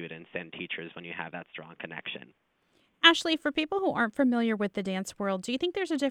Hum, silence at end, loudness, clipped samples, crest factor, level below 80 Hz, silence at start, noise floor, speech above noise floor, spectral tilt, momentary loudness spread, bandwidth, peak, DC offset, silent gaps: none; 0 s; -28 LUFS; under 0.1%; 26 dB; -70 dBFS; 0 s; -70 dBFS; 40 dB; -4 dB/octave; 18 LU; 14.5 kHz; -4 dBFS; under 0.1%; none